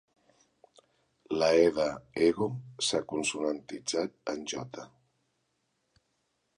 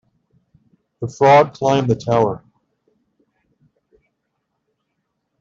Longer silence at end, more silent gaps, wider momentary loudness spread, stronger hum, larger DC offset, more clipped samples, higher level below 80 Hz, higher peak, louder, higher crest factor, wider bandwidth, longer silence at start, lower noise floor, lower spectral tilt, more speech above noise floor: second, 1.7 s vs 3.05 s; neither; second, 13 LU vs 19 LU; neither; neither; neither; second, -66 dBFS vs -56 dBFS; second, -10 dBFS vs -2 dBFS; second, -30 LUFS vs -15 LUFS; about the same, 22 dB vs 18 dB; first, 11.5 kHz vs 7.6 kHz; first, 1.3 s vs 1 s; first, -78 dBFS vs -74 dBFS; second, -4 dB/octave vs -6.5 dB/octave; second, 48 dB vs 59 dB